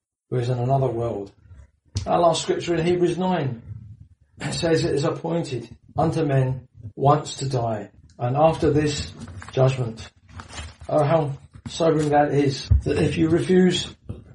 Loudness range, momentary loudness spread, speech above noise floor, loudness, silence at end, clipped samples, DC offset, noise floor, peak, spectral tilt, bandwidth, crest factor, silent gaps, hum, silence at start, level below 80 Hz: 4 LU; 18 LU; 27 dB; -22 LUFS; 0.15 s; under 0.1%; under 0.1%; -49 dBFS; -4 dBFS; -6.5 dB/octave; 11.5 kHz; 18 dB; none; none; 0.3 s; -38 dBFS